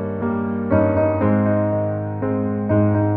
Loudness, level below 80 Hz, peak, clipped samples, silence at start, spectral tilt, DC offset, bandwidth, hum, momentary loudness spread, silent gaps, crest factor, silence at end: -20 LUFS; -46 dBFS; -4 dBFS; under 0.1%; 0 s; -13.5 dB/octave; under 0.1%; 3.4 kHz; none; 6 LU; none; 14 dB; 0 s